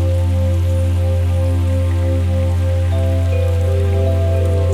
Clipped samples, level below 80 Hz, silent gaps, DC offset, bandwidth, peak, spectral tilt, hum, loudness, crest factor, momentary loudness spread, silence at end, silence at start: under 0.1%; -26 dBFS; none; under 0.1%; 10 kHz; -6 dBFS; -8 dB/octave; none; -17 LUFS; 8 dB; 1 LU; 0 s; 0 s